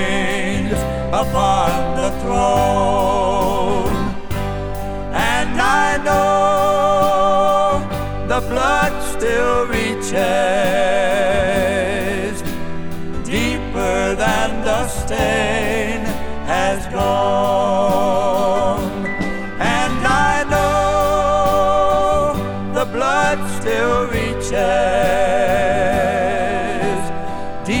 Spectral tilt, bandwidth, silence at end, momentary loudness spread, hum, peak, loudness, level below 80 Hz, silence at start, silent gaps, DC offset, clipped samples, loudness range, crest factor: -4.5 dB/octave; over 20 kHz; 0 s; 8 LU; none; -2 dBFS; -17 LUFS; -30 dBFS; 0 s; none; under 0.1%; under 0.1%; 3 LU; 14 dB